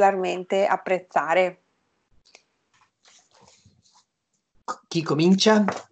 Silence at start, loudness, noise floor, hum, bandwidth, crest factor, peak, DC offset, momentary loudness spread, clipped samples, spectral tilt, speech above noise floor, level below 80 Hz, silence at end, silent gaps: 0 s; -22 LUFS; -77 dBFS; none; 8.8 kHz; 20 dB; -6 dBFS; under 0.1%; 13 LU; under 0.1%; -5 dB/octave; 55 dB; -74 dBFS; 0.1 s; none